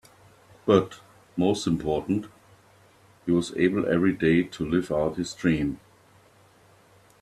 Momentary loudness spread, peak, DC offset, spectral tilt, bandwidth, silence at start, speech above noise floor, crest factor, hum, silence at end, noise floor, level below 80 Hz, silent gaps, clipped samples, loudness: 12 LU; -4 dBFS; under 0.1%; -6.5 dB/octave; 13 kHz; 0.65 s; 33 dB; 22 dB; none; 1.45 s; -57 dBFS; -54 dBFS; none; under 0.1%; -25 LUFS